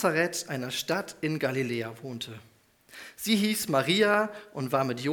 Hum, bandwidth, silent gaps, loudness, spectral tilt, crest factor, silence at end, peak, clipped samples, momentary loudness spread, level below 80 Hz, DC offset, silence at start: none; 19.5 kHz; none; -28 LUFS; -4 dB/octave; 20 dB; 0 s; -10 dBFS; under 0.1%; 15 LU; -70 dBFS; under 0.1%; 0 s